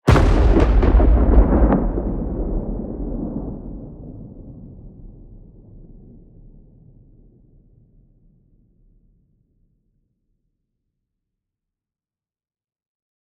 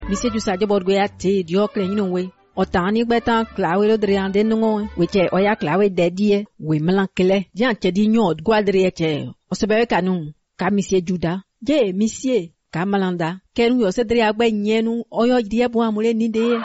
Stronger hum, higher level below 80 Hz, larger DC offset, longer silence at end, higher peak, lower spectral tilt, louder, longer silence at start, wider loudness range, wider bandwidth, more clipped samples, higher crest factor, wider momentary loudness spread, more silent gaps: neither; first, -22 dBFS vs -46 dBFS; neither; first, 7.6 s vs 0 s; first, -2 dBFS vs -8 dBFS; first, -8.5 dB/octave vs -5 dB/octave; about the same, -19 LUFS vs -19 LUFS; about the same, 0.05 s vs 0 s; first, 26 LU vs 2 LU; about the same, 7.6 kHz vs 8 kHz; neither; first, 20 dB vs 12 dB; first, 24 LU vs 6 LU; neither